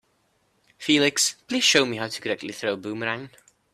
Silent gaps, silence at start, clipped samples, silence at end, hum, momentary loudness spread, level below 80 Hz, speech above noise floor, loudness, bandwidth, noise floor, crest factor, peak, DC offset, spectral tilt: none; 0.8 s; under 0.1%; 0.45 s; none; 11 LU; -68 dBFS; 44 dB; -23 LUFS; 15 kHz; -68 dBFS; 22 dB; -4 dBFS; under 0.1%; -2 dB/octave